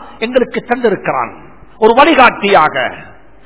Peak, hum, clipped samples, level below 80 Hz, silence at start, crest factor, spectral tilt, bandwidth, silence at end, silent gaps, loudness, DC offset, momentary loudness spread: 0 dBFS; none; 1%; -44 dBFS; 0 s; 12 dB; -8.5 dB/octave; 4 kHz; 0.4 s; none; -11 LUFS; 1%; 11 LU